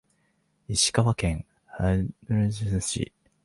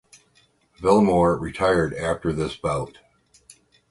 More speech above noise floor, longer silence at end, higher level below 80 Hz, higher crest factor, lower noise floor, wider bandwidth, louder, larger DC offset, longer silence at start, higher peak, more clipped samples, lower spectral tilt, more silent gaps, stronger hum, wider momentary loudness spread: about the same, 44 dB vs 41 dB; second, 0.4 s vs 1 s; about the same, -42 dBFS vs -44 dBFS; about the same, 18 dB vs 20 dB; first, -70 dBFS vs -62 dBFS; about the same, 11.5 kHz vs 11.5 kHz; second, -26 LUFS vs -22 LUFS; neither; about the same, 0.7 s vs 0.8 s; second, -8 dBFS vs -4 dBFS; neither; second, -4.5 dB/octave vs -6.5 dB/octave; neither; neither; first, 12 LU vs 9 LU